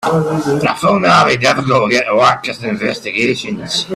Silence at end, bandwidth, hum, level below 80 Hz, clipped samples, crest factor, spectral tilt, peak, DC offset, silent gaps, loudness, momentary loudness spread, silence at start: 0 s; 14 kHz; none; -50 dBFS; under 0.1%; 14 dB; -4.5 dB/octave; 0 dBFS; under 0.1%; none; -13 LUFS; 9 LU; 0 s